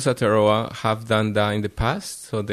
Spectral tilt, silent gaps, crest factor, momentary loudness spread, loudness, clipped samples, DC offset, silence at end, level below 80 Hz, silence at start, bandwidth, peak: -5.5 dB/octave; none; 16 dB; 10 LU; -22 LUFS; under 0.1%; under 0.1%; 0 s; -40 dBFS; 0 s; 13.5 kHz; -6 dBFS